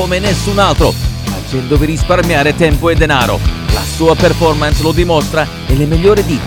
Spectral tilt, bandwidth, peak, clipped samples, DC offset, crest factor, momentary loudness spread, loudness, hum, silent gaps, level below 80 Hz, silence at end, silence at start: -5.5 dB/octave; 19 kHz; 0 dBFS; 0.2%; under 0.1%; 12 dB; 6 LU; -12 LUFS; none; none; -18 dBFS; 0 s; 0 s